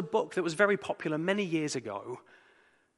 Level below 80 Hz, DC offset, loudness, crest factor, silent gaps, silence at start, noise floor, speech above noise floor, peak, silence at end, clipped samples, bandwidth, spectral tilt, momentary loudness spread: -80 dBFS; under 0.1%; -31 LUFS; 22 dB; none; 0 s; -66 dBFS; 34 dB; -10 dBFS; 0.8 s; under 0.1%; 11.5 kHz; -5 dB/octave; 13 LU